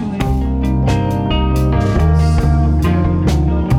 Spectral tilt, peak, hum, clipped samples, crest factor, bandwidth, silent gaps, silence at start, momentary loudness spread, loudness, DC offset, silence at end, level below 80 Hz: -7.5 dB/octave; -2 dBFS; none; under 0.1%; 10 dB; 13 kHz; none; 0 s; 4 LU; -15 LUFS; under 0.1%; 0 s; -18 dBFS